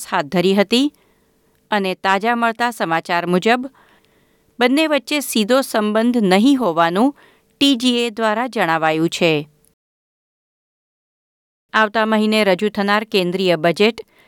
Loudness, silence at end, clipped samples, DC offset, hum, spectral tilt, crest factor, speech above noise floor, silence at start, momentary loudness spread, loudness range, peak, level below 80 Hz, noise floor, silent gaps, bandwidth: -17 LUFS; 0.25 s; under 0.1%; under 0.1%; none; -4.5 dB/octave; 16 dB; 43 dB; 0 s; 5 LU; 5 LU; -2 dBFS; -66 dBFS; -59 dBFS; 9.73-11.69 s; 18.5 kHz